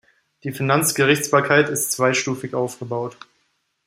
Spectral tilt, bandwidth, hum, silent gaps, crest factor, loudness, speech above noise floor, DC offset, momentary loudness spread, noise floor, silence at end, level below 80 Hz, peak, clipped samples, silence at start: -4 dB/octave; 16 kHz; none; none; 20 dB; -19 LUFS; 49 dB; under 0.1%; 12 LU; -69 dBFS; 0.75 s; -62 dBFS; -2 dBFS; under 0.1%; 0.45 s